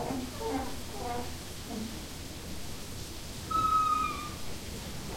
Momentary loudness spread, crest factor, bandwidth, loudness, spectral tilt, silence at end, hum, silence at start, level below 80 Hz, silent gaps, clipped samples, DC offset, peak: 14 LU; 16 dB; 16.5 kHz; -34 LUFS; -4 dB/octave; 0 s; none; 0 s; -48 dBFS; none; under 0.1%; under 0.1%; -18 dBFS